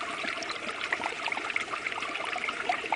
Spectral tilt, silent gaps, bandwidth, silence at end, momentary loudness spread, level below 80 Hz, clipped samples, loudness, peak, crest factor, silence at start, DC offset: -1.5 dB/octave; none; 10 kHz; 0 s; 3 LU; -68 dBFS; under 0.1%; -32 LUFS; -14 dBFS; 20 dB; 0 s; under 0.1%